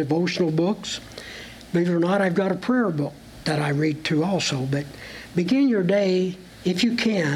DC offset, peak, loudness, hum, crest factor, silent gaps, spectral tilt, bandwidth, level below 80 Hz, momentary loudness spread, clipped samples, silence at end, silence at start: under 0.1%; -10 dBFS; -23 LUFS; none; 14 dB; none; -6 dB/octave; 14 kHz; -56 dBFS; 11 LU; under 0.1%; 0 s; 0 s